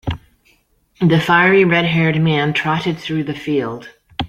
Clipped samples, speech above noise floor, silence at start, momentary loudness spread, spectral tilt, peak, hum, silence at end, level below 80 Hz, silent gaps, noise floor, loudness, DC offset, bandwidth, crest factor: under 0.1%; 42 dB; 0.05 s; 16 LU; -7 dB/octave; 0 dBFS; none; 0 s; -44 dBFS; none; -57 dBFS; -15 LUFS; under 0.1%; 8.4 kHz; 16 dB